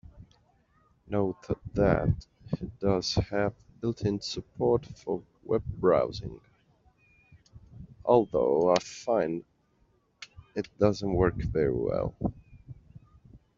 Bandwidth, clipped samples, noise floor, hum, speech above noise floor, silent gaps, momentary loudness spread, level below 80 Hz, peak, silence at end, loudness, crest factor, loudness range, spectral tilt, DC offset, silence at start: 7.8 kHz; under 0.1%; -68 dBFS; none; 40 dB; none; 14 LU; -48 dBFS; -6 dBFS; 0.2 s; -29 LUFS; 24 dB; 2 LU; -6 dB/octave; under 0.1%; 0.15 s